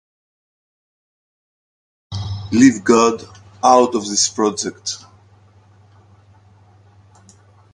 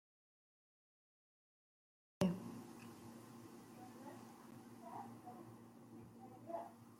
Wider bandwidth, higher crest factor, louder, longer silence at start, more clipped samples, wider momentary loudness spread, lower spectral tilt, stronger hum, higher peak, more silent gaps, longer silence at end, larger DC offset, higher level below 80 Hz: second, 11.5 kHz vs 16.5 kHz; second, 20 dB vs 32 dB; first, -16 LUFS vs -50 LUFS; about the same, 2.1 s vs 2.2 s; neither; about the same, 17 LU vs 18 LU; second, -4 dB/octave vs -6.5 dB/octave; neither; first, 0 dBFS vs -20 dBFS; neither; first, 2.75 s vs 0 s; neither; first, -50 dBFS vs -82 dBFS